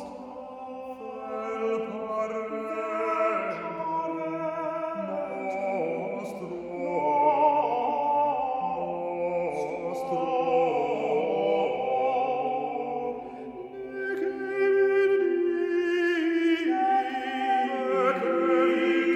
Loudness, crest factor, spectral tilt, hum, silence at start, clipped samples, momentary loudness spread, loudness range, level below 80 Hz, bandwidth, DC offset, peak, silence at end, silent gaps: -27 LUFS; 16 dB; -6 dB/octave; none; 0 s; under 0.1%; 13 LU; 5 LU; -68 dBFS; 10.5 kHz; under 0.1%; -12 dBFS; 0 s; none